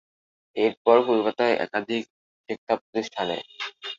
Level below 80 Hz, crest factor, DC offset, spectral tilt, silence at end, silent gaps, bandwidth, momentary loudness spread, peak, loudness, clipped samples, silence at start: -72 dBFS; 22 dB; under 0.1%; -5 dB/octave; 0.05 s; 0.77-0.85 s, 2.10-2.44 s, 2.58-2.67 s, 2.81-2.93 s; 7.6 kHz; 16 LU; -4 dBFS; -25 LUFS; under 0.1%; 0.55 s